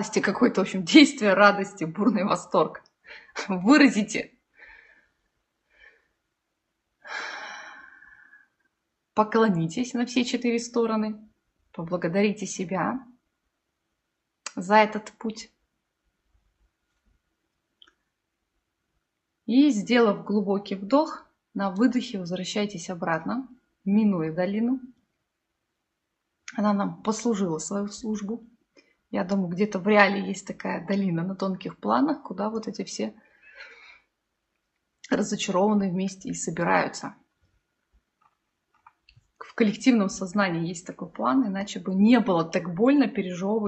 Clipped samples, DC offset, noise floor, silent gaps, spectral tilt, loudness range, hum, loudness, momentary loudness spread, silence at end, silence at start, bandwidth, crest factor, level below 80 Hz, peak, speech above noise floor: under 0.1%; under 0.1%; -80 dBFS; none; -5 dB/octave; 8 LU; none; -25 LUFS; 17 LU; 0 s; 0 s; 8.4 kHz; 24 dB; -68 dBFS; -2 dBFS; 56 dB